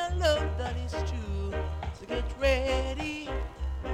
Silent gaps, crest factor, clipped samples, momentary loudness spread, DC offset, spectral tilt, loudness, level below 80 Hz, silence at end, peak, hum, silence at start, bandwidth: none; 18 dB; under 0.1%; 9 LU; under 0.1%; -5.5 dB/octave; -31 LUFS; -34 dBFS; 0 s; -12 dBFS; none; 0 s; 12 kHz